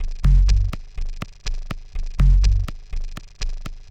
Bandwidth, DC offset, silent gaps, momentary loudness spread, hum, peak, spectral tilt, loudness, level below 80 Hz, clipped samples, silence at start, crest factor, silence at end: 7.8 kHz; under 0.1%; none; 17 LU; none; -6 dBFS; -5.5 dB/octave; -23 LUFS; -20 dBFS; under 0.1%; 0 s; 14 dB; 0 s